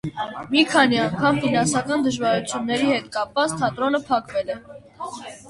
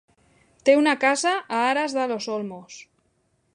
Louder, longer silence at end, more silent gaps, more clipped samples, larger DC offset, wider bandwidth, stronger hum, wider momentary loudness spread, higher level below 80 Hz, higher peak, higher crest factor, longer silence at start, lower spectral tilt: about the same, -21 LUFS vs -22 LUFS; second, 0 s vs 0.75 s; neither; neither; neither; about the same, 11.5 kHz vs 11 kHz; neither; second, 14 LU vs 20 LU; first, -56 dBFS vs -72 dBFS; about the same, -4 dBFS vs -4 dBFS; about the same, 18 dB vs 20 dB; second, 0.05 s vs 0.65 s; about the same, -4 dB/octave vs -3 dB/octave